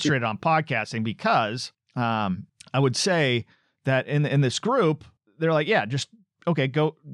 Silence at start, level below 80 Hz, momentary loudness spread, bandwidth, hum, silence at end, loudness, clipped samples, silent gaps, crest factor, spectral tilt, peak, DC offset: 0 s; -68 dBFS; 10 LU; 11.5 kHz; none; 0 s; -25 LUFS; under 0.1%; none; 14 dB; -5.5 dB/octave; -10 dBFS; under 0.1%